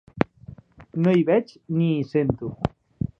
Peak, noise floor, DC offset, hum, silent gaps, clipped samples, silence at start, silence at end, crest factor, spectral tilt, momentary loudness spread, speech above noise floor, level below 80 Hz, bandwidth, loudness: 0 dBFS; -45 dBFS; under 0.1%; none; none; under 0.1%; 0.15 s; 0.5 s; 24 dB; -9.5 dB/octave; 11 LU; 24 dB; -48 dBFS; 6.6 kHz; -24 LUFS